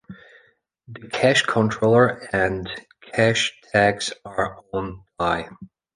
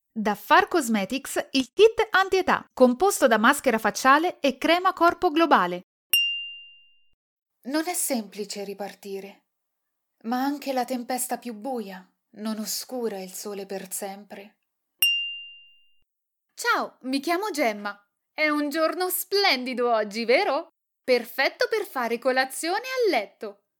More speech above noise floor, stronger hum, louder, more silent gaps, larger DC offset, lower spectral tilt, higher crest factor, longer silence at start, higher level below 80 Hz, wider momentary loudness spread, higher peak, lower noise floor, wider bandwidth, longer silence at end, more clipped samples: second, 38 dB vs 56 dB; neither; first, -21 LUFS vs -24 LUFS; second, none vs 5.83-6.10 s, 7.14-7.37 s; neither; first, -4.5 dB/octave vs -2.5 dB/octave; about the same, 20 dB vs 22 dB; about the same, 0.1 s vs 0.15 s; first, -50 dBFS vs -64 dBFS; second, 14 LU vs 17 LU; about the same, -2 dBFS vs -4 dBFS; second, -60 dBFS vs -81 dBFS; second, 10.5 kHz vs 19 kHz; about the same, 0.3 s vs 0.25 s; neither